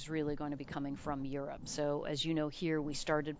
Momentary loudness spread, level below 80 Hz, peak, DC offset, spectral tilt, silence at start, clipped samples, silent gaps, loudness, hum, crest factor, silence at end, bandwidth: 6 LU; -58 dBFS; -18 dBFS; under 0.1%; -5 dB/octave; 0 s; under 0.1%; none; -38 LUFS; none; 18 dB; 0 s; 8 kHz